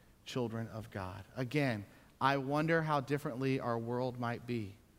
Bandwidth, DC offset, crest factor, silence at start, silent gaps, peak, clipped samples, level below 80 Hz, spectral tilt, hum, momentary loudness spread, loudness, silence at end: 16 kHz; under 0.1%; 22 dB; 0.25 s; none; -14 dBFS; under 0.1%; -68 dBFS; -7 dB/octave; none; 11 LU; -36 LUFS; 0.2 s